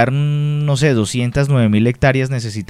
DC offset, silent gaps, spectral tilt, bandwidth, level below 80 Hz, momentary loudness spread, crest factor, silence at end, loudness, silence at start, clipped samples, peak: 0.3%; none; -6.5 dB/octave; 11.5 kHz; -40 dBFS; 4 LU; 14 dB; 0.05 s; -15 LUFS; 0 s; under 0.1%; -2 dBFS